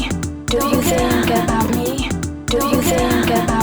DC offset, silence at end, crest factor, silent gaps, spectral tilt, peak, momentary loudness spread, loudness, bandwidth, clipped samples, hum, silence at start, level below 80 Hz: under 0.1%; 0 s; 14 dB; none; -4.5 dB/octave; -2 dBFS; 6 LU; -17 LUFS; over 20 kHz; under 0.1%; none; 0 s; -30 dBFS